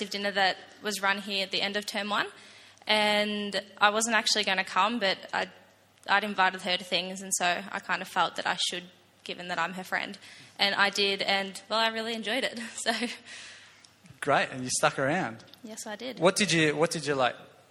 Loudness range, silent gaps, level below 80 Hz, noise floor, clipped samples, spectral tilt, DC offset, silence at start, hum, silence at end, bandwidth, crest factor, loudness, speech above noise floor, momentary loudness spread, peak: 4 LU; none; -74 dBFS; -55 dBFS; under 0.1%; -2.5 dB/octave; under 0.1%; 0 s; none; 0.25 s; 16 kHz; 24 dB; -28 LUFS; 26 dB; 14 LU; -6 dBFS